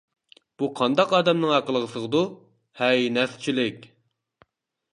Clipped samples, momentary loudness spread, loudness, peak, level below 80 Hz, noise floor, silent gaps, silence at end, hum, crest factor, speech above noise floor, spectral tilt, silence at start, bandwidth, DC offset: under 0.1%; 9 LU; -23 LUFS; -6 dBFS; -72 dBFS; -70 dBFS; none; 1.1 s; none; 20 dB; 47 dB; -5.5 dB/octave; 0.6 s; 11 kHz; under 0.1%